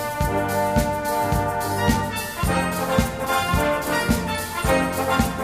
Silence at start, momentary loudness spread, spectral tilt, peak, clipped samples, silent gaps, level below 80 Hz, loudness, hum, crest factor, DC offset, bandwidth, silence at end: 0 s; 3 LU; -5 dB/octave; -4 dBFS; under 0.1%; none; -34 dBFS; -22 LUFS; none; 18 dB; 0.2%; 15.5 kHz; 0 s